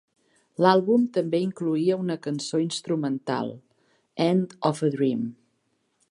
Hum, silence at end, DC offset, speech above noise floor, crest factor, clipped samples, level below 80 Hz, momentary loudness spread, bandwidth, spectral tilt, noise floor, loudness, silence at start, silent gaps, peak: none; 0.8 s; under 0.1%; 48 dB; 22 dB; under 0.1%; -76 dBFS; 10 LU; 11.5 kHz; -6 dB/octave; -72 dBFS; -25 LUFS; 0.6 s; none; -4 dBFS